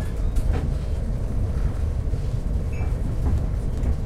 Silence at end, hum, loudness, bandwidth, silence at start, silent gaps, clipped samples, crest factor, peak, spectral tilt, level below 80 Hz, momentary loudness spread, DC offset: 0 s; none; -27 LUFS; 12 kHz; 0 s; none; under 0.1%; 12 dB; -10 dBFS; -8 dB/octave; -24 dBFS; 3 LU; under 0.1%